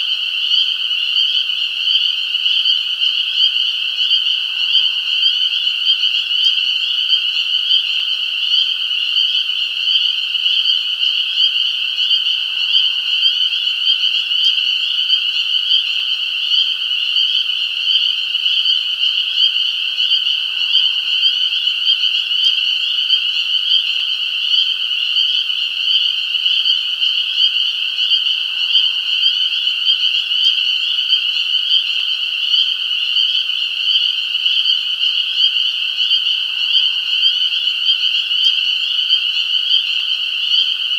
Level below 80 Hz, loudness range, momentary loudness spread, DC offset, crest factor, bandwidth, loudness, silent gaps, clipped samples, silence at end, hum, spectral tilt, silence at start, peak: -78 dBFS; 1 LU; 3 LU; under 0.1%; 16 dB; 16.5 kHz; -13 LUFS; none; under 0.1%; 0 s; none; 4 dB/octave; 0 s; 0 dBFS